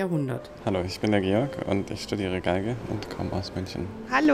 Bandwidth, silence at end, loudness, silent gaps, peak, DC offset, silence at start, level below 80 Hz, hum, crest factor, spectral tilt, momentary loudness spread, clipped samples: 15 kHz; 0 s; -28 LUFS; none; -8 dBFS; under 0.1%; 0 s; -50 dBFS; none; 20 dB; -6.5 dB/octave; 9 LU; under 0.1%